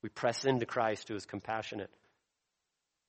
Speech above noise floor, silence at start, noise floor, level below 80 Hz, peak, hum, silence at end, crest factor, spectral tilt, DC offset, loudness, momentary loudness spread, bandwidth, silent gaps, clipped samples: 51 dB; 0.05 s; -86 dBFS; -74 dBFS; -16 dBFS; none; 1.2 s; 20 dB; -5 dB/octave; under 0.1%; -35 LUFS; 11 LU; 8.4 kHz; none; under 0.1%